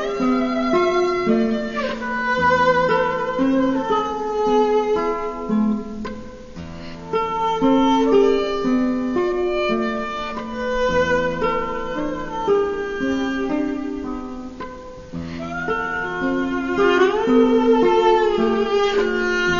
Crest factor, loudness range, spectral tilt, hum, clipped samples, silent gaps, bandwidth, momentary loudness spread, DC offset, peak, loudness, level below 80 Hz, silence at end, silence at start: 14 dB; 6 LU; -5.5 dB/octave; none; under 0.1%; none; 7.4 kHz; 14 LU; 0.2%; -4 dBFS; -20 LUFS; -40 dBFS; 0 s; 0 s